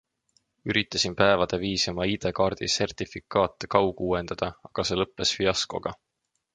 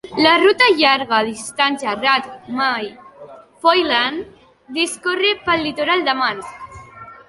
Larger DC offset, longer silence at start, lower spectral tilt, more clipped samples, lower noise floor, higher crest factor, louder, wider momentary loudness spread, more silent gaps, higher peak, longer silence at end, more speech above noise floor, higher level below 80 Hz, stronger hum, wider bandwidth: neither; first, 0.65 s vs 0.05 s; about the same, -3.5 dB/octave vs -2.5 dB/octave; neither; first, -70 dBFS vs -41 dBFS; first, 24 dB vs 18 dB; second, -26 LUFS vs -16 LUFS; second, 9 LU vs 18 LU; neither; second, -4 dBFS vs 0 dBFS; first, 0.6 s vs 0.15 s; first, 44 dB vs 23 dB; first, -50 dBFS vs -56 dBFS; neither; about the same, 11 kHz vs 11.5 kHz